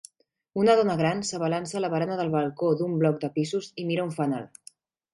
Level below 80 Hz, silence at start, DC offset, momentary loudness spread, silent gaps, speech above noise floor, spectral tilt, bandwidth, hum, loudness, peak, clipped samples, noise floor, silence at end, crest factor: -68 dBFS; 0.55 s; under 0.1%; 8 LU; none; 29 dB; -6 dB/octave; 11.5 kHz; none; -26 LUFS; -8 dBFS; under 0.1%; -55 dBFS; 0.65 s; 18 dB